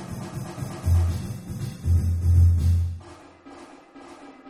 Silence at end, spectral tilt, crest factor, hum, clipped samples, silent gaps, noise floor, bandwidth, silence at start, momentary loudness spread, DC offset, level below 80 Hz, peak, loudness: 0 s; -7.5 dB/octave; 16 dB; none; under 0.1%; none; -46 dBFS; 13 kHz; 0 s; 25 LU; under 0.1%; -32 dBFS; -8 dBFS; -24 LUFS